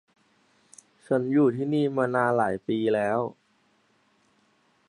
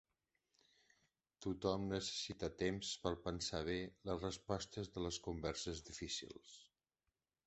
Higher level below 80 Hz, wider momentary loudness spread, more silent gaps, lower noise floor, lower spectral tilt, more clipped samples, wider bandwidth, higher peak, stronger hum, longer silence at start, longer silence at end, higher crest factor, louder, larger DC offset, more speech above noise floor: second, -70 dBFS vs -62 dBFS; about the same, 5 LU vs 7 LU; neither; second, -67 dBFS vs under -90 dBFS; first, -7.5 dB/octave vs -4 dB/octave; neither; first, 11 kHz vs 8.2 kHz; first, -8 dBFS vs -22 dBFS; neither; second, 1.1 s vs 1.4 s; first, 1.55 s vs 0.85 s; second, 18 dB vs 24 dB; first, -25 LUFS vs -44 LUFS; neither; second, 42 dB vs over 46 dB